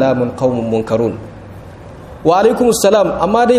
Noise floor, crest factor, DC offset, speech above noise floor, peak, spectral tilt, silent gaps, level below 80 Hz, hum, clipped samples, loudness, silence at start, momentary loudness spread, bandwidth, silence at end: -33 dBFS; 14 dB; under 0.1%; 21 dB; 0 dBFS; -5.5 dB/octave; none; -42 dBFS; none; under 0.1%; -14 LUFS; 0 s; 23 LU; 15.5 kHz; 0 s